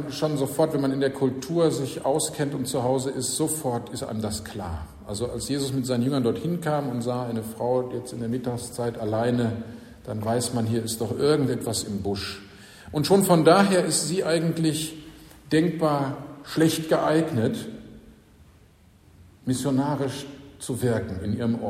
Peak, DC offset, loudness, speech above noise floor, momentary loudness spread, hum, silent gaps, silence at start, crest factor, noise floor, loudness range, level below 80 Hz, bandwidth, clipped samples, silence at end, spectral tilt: -4 dBFS; under 0.1%; -25 LUFS; 30 dB; 12 LU; none; none; 0 s; 20 dB; -55 dBFS; 6 LU; -52 dBFS; 16 kHz; under 0.1%; 0 s; -5 dB/octave